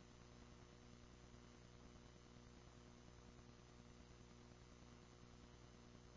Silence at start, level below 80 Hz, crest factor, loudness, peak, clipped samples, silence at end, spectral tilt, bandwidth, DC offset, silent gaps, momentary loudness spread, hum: 0 s; -70 dBFS; 14 dB; -65 LUFS; -48 dBFS; under 0.1%; 0 s; -5 dB/octave; 8 kHz; under 0.1%; none; 1 LU; 60 Hz at -65 dBFS